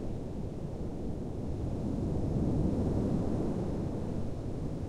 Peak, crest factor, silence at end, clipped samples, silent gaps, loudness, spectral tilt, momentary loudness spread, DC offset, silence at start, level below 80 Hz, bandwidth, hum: -20 dBFS; 14 dB; 0 s; under 0.1%; none; -35 LUFS; -9 dB/octave; 8 LU; under 0.1%; 0 s; -42 dBFS; 11.5 kHz; none